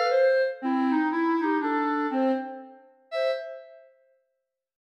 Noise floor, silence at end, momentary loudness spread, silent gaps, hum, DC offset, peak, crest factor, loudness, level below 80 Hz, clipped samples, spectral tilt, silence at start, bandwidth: -81 dBFS; 1.05 s; 15 LU; none; none; under 0.1%; -14 dBFS; 14 dB; -26 LUFS; under -90 dBFS; under 0.1%; -4.5 dB/octave; 0 s; 7.6 kHz